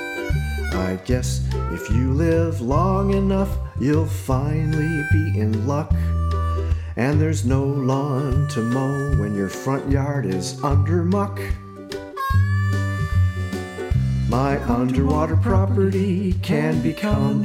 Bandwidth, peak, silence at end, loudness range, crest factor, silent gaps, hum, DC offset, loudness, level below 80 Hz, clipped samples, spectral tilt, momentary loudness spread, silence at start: 15 kHz; -6 dBFS; 0 s; 2 LU; 14 dB; none; none; under 0.1%; -21 LUFS; -30 dBFS; under 0.1%; -7.5 dB/octave; 6 LU; 0 s